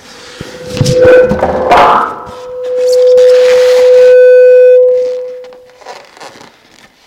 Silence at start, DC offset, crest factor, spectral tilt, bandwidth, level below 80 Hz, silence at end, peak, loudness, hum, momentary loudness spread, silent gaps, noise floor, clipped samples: 0.25 s; under 0.1%; 8 dB; -5 dB/octave; 11.5 kHz; -38 dBFS; 0.8 s; 0 dBFS; -6 LUFS; none; 21 LU; none; -42 dBFS; 2%